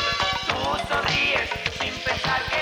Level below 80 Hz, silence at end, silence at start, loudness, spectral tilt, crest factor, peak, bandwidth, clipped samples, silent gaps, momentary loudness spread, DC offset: -44 dBFS; 0 s; 0 s; -23 LUFS; -3 dB/octave; 16 dB; -8 dBFS; 19 kHz; under 0.1%; none; 6 LU; under 0.1%